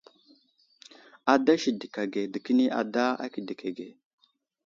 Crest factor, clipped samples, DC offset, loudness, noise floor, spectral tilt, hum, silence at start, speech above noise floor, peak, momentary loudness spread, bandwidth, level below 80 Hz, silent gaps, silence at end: 22 dB; under 0.1%; under 0.1%; -28 LUFS; -65 dBFS; -5 dB/octave; none; 1.25 s; 38 dB; -6 dBFS; 13 LU; 7.4 kHz; -78 dBFS; none; 0.75 s